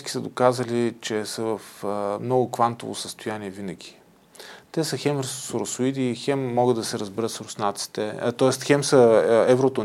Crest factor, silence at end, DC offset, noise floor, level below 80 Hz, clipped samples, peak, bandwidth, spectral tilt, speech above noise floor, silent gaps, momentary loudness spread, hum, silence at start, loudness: 20 dB; 0 s; under 0.1%; -47 dBFS; -70 dBFS; under 0.1%; -4 dBFS; 16 kHz; -5 dB/octave; 24 dB; none; 14 LU; none; 0 s; -23 LUFS